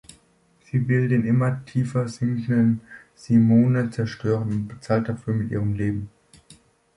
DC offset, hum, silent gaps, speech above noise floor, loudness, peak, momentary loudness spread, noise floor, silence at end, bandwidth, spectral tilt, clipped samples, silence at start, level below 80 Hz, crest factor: under 0.1%; none; none; 39 dB; -23 LUFS; -6 dBFS; 10 LU; -60 dBFS; 0.9 s; 11.5 kHz; -8.5 dB/octave; under 0.1%; 0.75 s; -52 dBFS; 16 dB